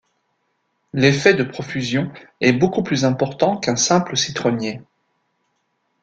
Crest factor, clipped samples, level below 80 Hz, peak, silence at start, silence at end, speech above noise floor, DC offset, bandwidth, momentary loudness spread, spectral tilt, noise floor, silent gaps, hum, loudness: 20 dB; under 0.1%; -56 dBFS; -2 dBFS; 0.95 s; 1.2 s; 51 dB; under 0.1%; 9.2 kHz; 10 LU; -4.5 dB/octave; -70 dBFS; none; none; -19 LUFS